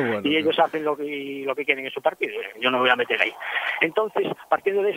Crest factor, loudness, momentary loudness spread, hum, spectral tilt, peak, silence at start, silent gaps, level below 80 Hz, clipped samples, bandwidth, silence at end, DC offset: 22 dB; -23 LUFS; 8 LU; none; -5 dB/octave; -2 dBFS; 0 s; none; -72 dBFS; under 0.1%; 16 kHz; 0 s; under 0.1%